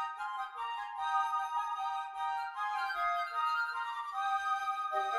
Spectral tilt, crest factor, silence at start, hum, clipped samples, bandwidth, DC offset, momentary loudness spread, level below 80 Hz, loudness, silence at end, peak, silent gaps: 0.5 dB/octave; 14 dB; 0 s; none; under 0.1%; 14.5 kHz; under 0.1%; 6 LU; -76 dBFS; -35 LUFS; 0 s; -22 dBFS; none